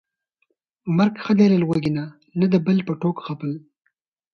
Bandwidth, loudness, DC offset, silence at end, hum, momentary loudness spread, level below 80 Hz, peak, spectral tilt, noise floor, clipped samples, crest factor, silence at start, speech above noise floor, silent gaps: 6.6 kHz; -21 LUFS; under 0.1%; 0.75 s; none; 14 LU; -60 dBFS; -4 dBFS; -8.5 dB/octave; -72 dBFS; under 0.1%; 16 dB; 0.85 s; 52 dB; none